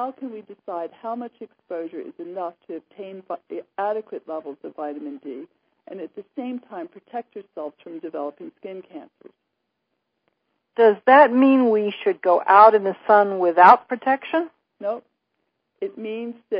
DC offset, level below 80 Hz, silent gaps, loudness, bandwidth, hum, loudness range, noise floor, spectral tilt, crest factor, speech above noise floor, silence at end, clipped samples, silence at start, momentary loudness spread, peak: under 0.1%; -76 dBFS; none; -18 LUFS; 5.4 kHz; none; 19 LU; -77 dBFS; -7.5 dB/octave; 22 dB; 56 dB; 0 s; under 0.1%; 0 s; 23 LU; 0 dBFS